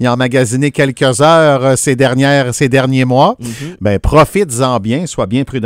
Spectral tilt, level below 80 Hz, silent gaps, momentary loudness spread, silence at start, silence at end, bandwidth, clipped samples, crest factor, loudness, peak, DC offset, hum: -5.5 dB/octave; -30 dBFS; none; 8 LU; 0 s; 0 s; 16 kHz; 0.4%; 10 dB; -11 LUFS; 0 dBFS; under 0.1%; none